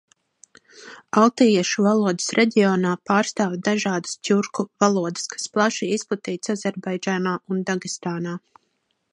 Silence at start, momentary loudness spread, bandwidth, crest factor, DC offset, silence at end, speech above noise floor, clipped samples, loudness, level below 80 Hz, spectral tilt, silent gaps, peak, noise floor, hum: 0.75 s; 10 LU; 11 kHz; 20 dB; under 0.1%; 0.75 s; 50 dB; under 0.1%; -22 LUFS; -70 dBFS; -4.5 dB/octave; none; -2 dBFS; -71 dBFS; none